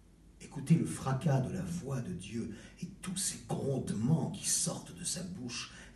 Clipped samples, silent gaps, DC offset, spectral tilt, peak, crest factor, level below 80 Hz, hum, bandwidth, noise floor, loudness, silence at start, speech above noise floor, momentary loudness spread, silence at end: under 0.1%; none; under 0.1%; -5 dB/octave; -16 dBFS; 20 dB; -60 dBFS; none; 12.5 kHz; -55 dBFS; -35 LUFS; 0.1 s; 20 dB; 14 LU; 0 s